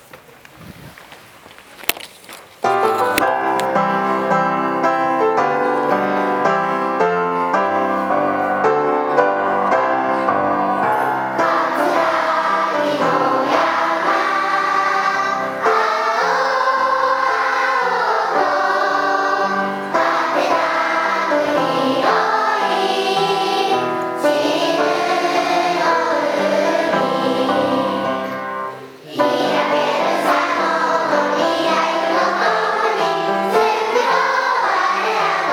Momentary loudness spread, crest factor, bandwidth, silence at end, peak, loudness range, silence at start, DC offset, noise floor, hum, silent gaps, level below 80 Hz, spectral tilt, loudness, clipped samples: 3 LU; 18 dB; over 20 kHz; 0 s; 0 dBFS; 2 LU; 0.15 s; under 0.1%; -42 dBFS; none; none; -64 dBFS; -4 dB/octave; -17 LUFS; under 0.1%